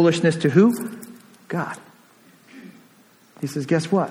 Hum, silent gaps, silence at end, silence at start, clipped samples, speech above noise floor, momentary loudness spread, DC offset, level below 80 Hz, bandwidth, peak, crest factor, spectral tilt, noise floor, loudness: none; none; 0 s; 0 s; under 0.1%; 35 dB; 21 LU; under 0.1%; -66 dBFS; 16.5 kHz; -4 dBFS; 18 dB; -6.5 dB/octave; -54 dBFS; -21 LUFS